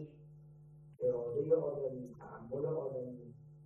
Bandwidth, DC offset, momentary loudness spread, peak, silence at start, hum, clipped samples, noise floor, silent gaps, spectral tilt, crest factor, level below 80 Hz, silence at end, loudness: 2.7 kHz; under 0.1%; 25 LU; -20 dBFS; 0 s; none; under 0.1%; -58 dBFS; none; -11 dB/octave; 20 dB; -72 dBFS; 0 s; -38 LUFS